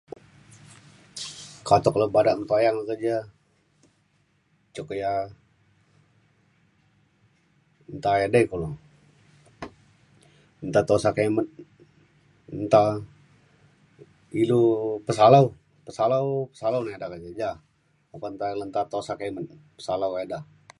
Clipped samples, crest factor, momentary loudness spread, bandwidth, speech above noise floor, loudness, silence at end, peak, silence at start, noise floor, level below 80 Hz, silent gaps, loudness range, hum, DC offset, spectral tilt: under 0.1%; 22 dB; 20 LU; 11.5 kHz; 44 dB; -24 LUFS; 0.35 s; -4 dBFS; 1.15 s; -67 dBFS; -58 dBFS; none; 14 LU; none; under 0.1%; -6.5 dB/octave